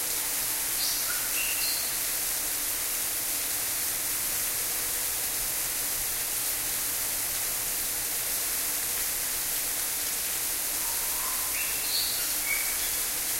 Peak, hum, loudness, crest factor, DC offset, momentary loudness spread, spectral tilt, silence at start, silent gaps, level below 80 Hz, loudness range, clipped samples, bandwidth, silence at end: -14 dBFS; none; -26 LUFS; 16 dB; under 0.1%; 2 LU; 1 dB/octave; 0 s; none; -52 dBFS; 1 LU; under 0.1%; 16 kHz; 0 s